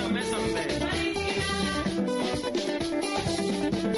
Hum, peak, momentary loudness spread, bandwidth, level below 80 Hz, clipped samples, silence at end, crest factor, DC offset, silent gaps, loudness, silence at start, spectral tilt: none; -16 dBFS; 2 LU; 15 kHz; -46 dBFS; under 0.1%; 0 s; 12 dB; under 0.1%; none; -28 LUFS; 0 s; -4.5 dB/octave